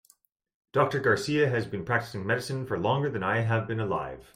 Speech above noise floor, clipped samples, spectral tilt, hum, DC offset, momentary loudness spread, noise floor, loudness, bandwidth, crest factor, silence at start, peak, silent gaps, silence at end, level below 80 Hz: 37 dB; under 0.1%; -6 dB/octave; none; under 0.1%; 6 LU; -65 dBFS; -28 LUFS; 15.5 kHz; 18 dB; 0.75 s; -10 dBFS; none; 0.15 s; -60 dBFS